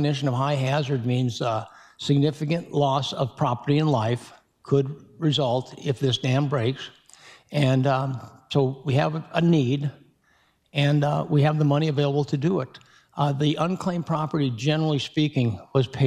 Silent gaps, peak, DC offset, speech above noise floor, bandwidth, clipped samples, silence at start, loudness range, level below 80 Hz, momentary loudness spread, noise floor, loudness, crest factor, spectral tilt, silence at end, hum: none; -6 dBFS; under 0.1%; 41 dB; 9.6 kHz; under 0.1%; 0 s; 2 LU; -62 dBFS; 8 LU; -64 dBFS; -24 LUFS; 18 dB; -7 dB/octave; 0 s; none